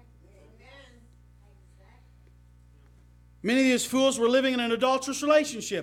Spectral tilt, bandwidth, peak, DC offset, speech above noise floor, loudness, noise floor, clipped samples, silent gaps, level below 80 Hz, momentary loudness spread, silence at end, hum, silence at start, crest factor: -3 dB/octave; 16 kHz; -10 dBFS; under 0.1%; 31 dB; -24 LUFS; -55 dBFS; under 0.1%; none; -58 dBFS; 4 LU; 0 s; 60 Hz at -55 dBFS; 0.75 s; 18 dB